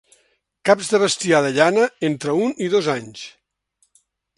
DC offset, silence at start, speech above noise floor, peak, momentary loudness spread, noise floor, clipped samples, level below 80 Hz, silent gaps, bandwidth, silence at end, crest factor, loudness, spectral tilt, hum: under 0.1%; 0.65 s; 48 dB; 0 dBFS; 12 LU; -67 dBFS; under 0.1%; -66 dBFS; none; 11.5 kHz; 1.1 s; 20 dB; -19 LUFS; -4 dB/octave; none